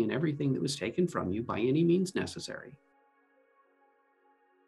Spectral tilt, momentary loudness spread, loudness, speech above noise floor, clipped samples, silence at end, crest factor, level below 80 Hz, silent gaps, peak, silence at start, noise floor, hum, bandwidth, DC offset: -6 dB/octave; 14 LU; -31 LUFS; 38 dB; under 0.1%; 1.9 s; 16 dB; -70 dBFS; none; -16 dBFS; 0 s; -68 dBFS; none; 12.5 kHz; under 0.1%